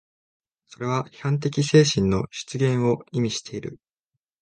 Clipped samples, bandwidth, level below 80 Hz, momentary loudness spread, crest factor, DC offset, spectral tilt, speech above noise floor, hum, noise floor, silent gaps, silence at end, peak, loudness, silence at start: under 0.1%; 10 kHz; -50 dBFS; 15 LU; 20 dB; under 0.1%; -5.5 dB/octave; 60 dB; none; -83 dBFS; none; 0.65 s; -4 dBFS; -23 LUFS; 0.8 s